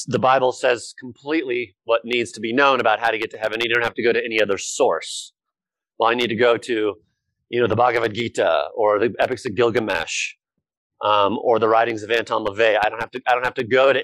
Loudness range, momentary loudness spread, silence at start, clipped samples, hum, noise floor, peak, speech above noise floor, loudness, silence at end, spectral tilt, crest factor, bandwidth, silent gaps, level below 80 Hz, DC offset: 2 LU; 9 LU; 0 s; under 0.1%; none; -86 dBFS; -2 dBFS; 66 dB; -20 LUFS; 0 s; -4 dB/octave; 18 dB; 14.5 kHz; 10.77-10.90 s; -58 dBFS; under 0.1%